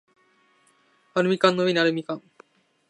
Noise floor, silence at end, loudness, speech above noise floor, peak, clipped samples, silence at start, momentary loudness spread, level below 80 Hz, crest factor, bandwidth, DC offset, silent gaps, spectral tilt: -63 dBFS; 0.7 s; -23 LUFS; 41 dB; -2 dBFS; under 0.1%; 1.15 s; 14 LU; -76 dBFS; 24 dB; 11 kHz; under 0.1%; none; -5.5 dB/octave